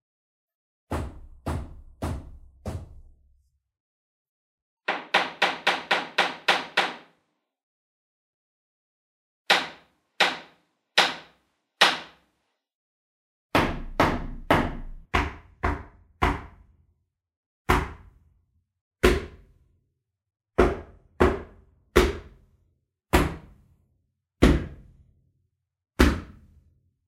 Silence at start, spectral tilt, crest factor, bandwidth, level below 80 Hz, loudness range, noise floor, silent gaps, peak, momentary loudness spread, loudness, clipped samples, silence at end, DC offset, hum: 0.9 s; -4.5 dB/octave; 28 dB; 16 kHz; -36 dBFS; 7 LU; -77 dBFS; 3.80-4.77 s, 7.63-9.45 s, 12.75-13.49 s, 17.36-17.65 s, 18.81-18.91 s; -2 dBFS; 17 LU; -25 LUFS; under 0.1%; 0.75 s; under 0.1%; none